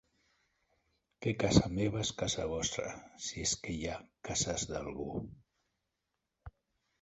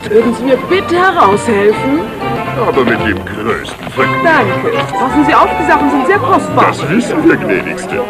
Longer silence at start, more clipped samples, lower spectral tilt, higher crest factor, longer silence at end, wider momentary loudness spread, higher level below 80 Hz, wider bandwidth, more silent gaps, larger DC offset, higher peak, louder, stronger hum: first, 1.2 s vs 0 s; second, under 0.1% vs 0.3%; second, -4 dB/octave vs -6 dB/octave; first, 28 dB vs 12 dB; first, 0.5 s vs 0 s; first, 13 LU vs 8 LU; second, -52 dBFS vs -38 dBFS; second, 8.2 kHz vs 14.5 kHz; neither; neither; second, -10 dBFS vs 0 dBFS; second, -35 LUFS vs -11 LUFS; neither